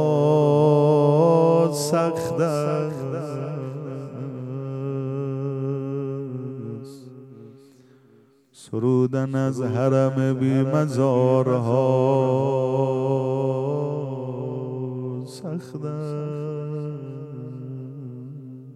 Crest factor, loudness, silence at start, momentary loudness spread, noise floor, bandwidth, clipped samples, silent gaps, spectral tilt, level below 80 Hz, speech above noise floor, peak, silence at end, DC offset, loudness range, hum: 18 dB; -23 LUFS; 0 s; 18 LU; -56 dBFS; 13.5 kHz; under 0.1%; none; -8 dB/octave; -70 dBFS; 35 dB; -6 dBFS; 0 s; under 0.1%; 11 LU; none